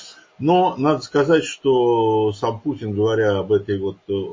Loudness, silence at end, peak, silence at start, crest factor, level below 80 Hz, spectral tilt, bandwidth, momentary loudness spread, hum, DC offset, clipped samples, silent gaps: -19 LUFS; 0 s; -4 dBFS; 0 s; 16 dB; -52 dBFS; -6.5 dB/octave; 7.6 kHz; 8 LU; none; under 0.1%; under 0.1%; none